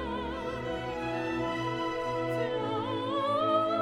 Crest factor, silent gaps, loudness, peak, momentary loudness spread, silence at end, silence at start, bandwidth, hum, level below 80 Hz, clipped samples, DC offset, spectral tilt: 14 dB; none; -31 LUFS; -16 dBFS; 8 LU; 0 s; 0 s; 14 kHz; none; -52 dBFS; under 0.1%; under 0.1%; -6 dB/octave